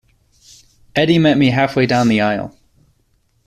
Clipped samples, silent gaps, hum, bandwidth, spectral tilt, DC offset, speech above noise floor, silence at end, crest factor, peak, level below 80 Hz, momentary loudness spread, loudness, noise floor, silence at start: under 0.1%; none; none; 13.5 kHz; -6.5 dB/octave; under 0.1%; 47 dB; 0.95 s; 16 dB; -2 dBFS; -50 dBFS; 10 LU; -15 LUFS; -61 dBFS; 0.95 s